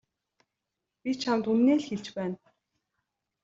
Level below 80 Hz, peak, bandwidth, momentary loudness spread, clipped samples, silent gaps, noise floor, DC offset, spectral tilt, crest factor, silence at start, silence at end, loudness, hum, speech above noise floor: -72 dBFS; -14 dBFS; 7.8 kHz; 14 LU; under 0.1%; none; -86 dBFS; under 0.1%; -6 dB/octave; 18 dB; 1.05 s; 1.1 s; -28 LUFS; none; 59 dB